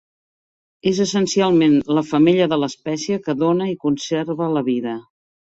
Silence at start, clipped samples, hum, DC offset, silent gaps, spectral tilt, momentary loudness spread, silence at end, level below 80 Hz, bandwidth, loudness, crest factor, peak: 0.85 s; under 0.1%; none; under 0.1%; none; -5.5 dB/octave; 9 LU; 0.5 s; -58 dBFS; 8 kHz; -19 LUFS; 16 dB; -4 dBFS